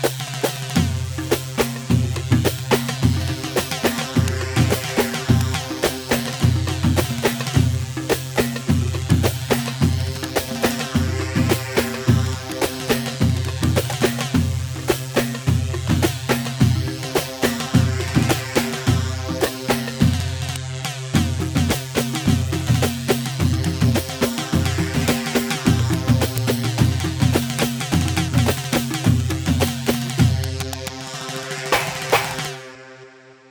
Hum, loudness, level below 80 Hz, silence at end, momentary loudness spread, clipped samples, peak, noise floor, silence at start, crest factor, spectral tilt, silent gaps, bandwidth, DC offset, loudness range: none; -21 LUFS; -36 dBFS; 0.2 s; 5 LU; under 0.1%; -2 dBFS; -45 dBFS; 0 s; 18 dB; -5 dB/octave; none; over 20 kHz; under 0.1%; 2 LU